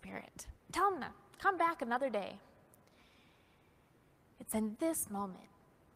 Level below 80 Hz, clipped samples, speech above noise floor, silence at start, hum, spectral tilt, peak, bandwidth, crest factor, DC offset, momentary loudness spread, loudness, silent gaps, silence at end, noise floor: -68 dBFS; under 0.1%; 32 dB; 0.05 s; none; -4 dB/octave; -18 dBFS; 15.5 kHz; 22 dB; under 0.1%; 18 LU; -37 LUFS; none; 0.5 s; -68 dBFS